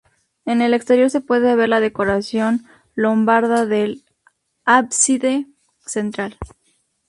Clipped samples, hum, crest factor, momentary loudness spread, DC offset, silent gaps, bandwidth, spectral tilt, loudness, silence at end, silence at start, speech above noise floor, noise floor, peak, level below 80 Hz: under 0.1%; none; 18 dB; 16 LU; under 0.1%; none; 11.5 kHz; -3.5 dB/octave; -17 LUFS; 0.6 s; 0.45 s; 48 dB; -64 dBFS; -2 dBFS; -50 dBFS